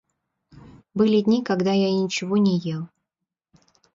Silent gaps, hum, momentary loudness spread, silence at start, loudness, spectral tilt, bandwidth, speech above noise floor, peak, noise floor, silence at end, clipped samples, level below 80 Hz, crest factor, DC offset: none; none; 13 LU; 0.95 s; -22 LUFS; -6.5 dB/octave; 7.6 kHz; 64 dB; -8 dBFS; -84 dBFS; 1.1 s; under 0.1%; -64 dBFS; 16 dB; under 0.1%